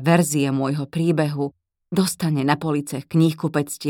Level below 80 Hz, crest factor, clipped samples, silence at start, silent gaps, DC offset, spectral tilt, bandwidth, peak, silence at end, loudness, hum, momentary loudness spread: -62 dBFS; 18 dB; under 0.1%; 0 s; none; under 0.1%; -6 dB/octave; 17.5 kHz; -2 dBFS; 0 s; -22 LUFS; none; 7 LU